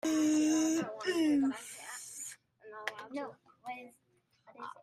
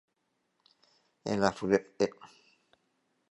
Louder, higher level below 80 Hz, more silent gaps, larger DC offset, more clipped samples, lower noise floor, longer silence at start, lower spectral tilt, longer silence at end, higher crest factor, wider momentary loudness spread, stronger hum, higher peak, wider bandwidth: second, -34 LUFS vs -31 LUFS; second, -80 dBFS vs -66 dBFS; neither; neither; neither; second, -74 dBFS vs -79 dBFS; second, 0.05 s vs 1.25 s; second, -3 dB/octave vs -5.5 dB/octave; second, 0.1 s vs 1.05 s; second, 18 dB vs 24 dB; first, 19 LU vs 7 LU; neither; second, -18 dBFS vs -10 dBFS; first, 14.5 kHz vs 11 kHz